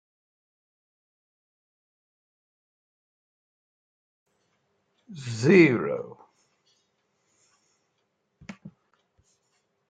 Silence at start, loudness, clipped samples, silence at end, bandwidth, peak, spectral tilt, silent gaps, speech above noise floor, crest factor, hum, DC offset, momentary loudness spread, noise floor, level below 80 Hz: 5.1 s; -22 LUFS; under 0.1%; 1.2 s; 9.2 kHz; -4 dBFS; -7 dB/octave; none; 54 dB; 28 dB; none; under 0.1%; 28 LU; -76 dBFS; -72 dBFS